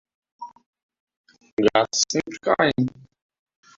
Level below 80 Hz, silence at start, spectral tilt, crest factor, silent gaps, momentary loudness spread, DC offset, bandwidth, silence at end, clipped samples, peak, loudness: -60 dBFS; 0.4 s; -3.5 dB/octave; 24 dB; 0.66-0.73 s, 0.82-0.89 s, 1.00-1.07 s, 1.17-1.24 s, 1.52-1.57 s; 22 LU; under 0.1%; 7.8 kHz; 0.9 s; under 0.1%; -2 dBFS; -22 LUFS